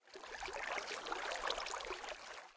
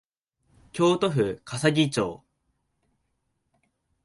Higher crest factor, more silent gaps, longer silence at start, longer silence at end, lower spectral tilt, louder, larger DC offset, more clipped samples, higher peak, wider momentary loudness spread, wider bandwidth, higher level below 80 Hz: about the same, 20 dB vs 22 dB; neither; second, 0.05 s vs 0.75 s; second, 0 s vs 1.9 s; second, -0.5 dB/octave vs -5.5 dB/octave; second, -43 LUFS vs -25 LUFS; neither; neither; second, -24 dBFS vs -8 dBFS; about the same, 8 LU vs 8 LU; second, 8 kHz vs 11.5 kHz; second, -68 dBFS vs -62 dBFS